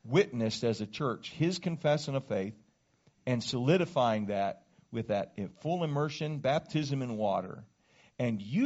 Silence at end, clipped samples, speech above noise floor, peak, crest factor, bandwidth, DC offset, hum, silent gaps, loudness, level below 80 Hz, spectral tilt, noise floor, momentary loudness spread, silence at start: 0 s; under 0.1%; 38 dB; -12 dBFS; 20 dB; 8 kHz; under 0.1%; none; none; -32 LUFS; -68 dBFS; -5.5 dB/octave; -69 dBFS; 11 LU; 0.05 s